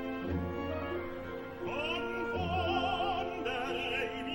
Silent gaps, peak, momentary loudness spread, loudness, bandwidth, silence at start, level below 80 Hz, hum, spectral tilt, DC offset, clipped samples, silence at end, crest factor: none; -20 dBFS; 8 LU; -35 LUFS; 16 kHz; 0 s; -52 dBFS; none; -6 dB/octave; under 0.1%; under 0.1%; 0 s; 16 dB